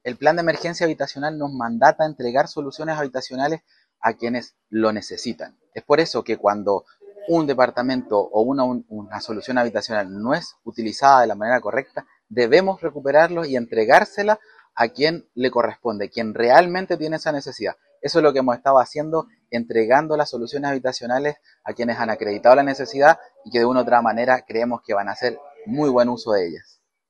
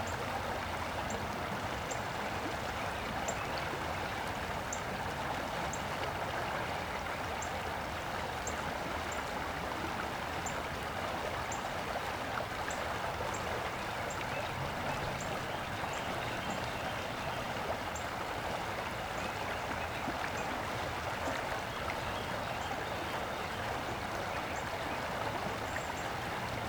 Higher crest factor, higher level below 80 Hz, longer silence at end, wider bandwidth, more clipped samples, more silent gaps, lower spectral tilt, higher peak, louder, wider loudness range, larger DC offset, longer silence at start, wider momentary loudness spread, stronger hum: about the same, 20 dB vs 16 dB; second, -64 dBFS vs -54 dBFS; first, 0.5 s vs 0 s; second, 9.6 kHz vs over 20 kHz; neither; neither; about the same, -5 dB/octave vs -4 dB/octave; first, 0 dBFS vs -22 dBFS; first, -20 LUFS vs -37 LUFS; first, 5 LU vs 0 LU; neither; about the same, 0.05 s vs 0 s; first, 13 LU vs 1 LU; neither